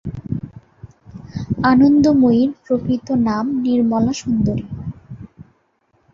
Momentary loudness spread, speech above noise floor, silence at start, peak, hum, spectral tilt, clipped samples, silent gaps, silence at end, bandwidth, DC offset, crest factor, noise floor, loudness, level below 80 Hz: 20 LU; 47 dB; 0.05 s; -2 dBFS; none; -7 dB/octave; under 0.1%; none; 0.7 s; 7.6 kHz; under 0.1%; 16 dB; -62 dBFS; -17 LUFS; -42 dBFS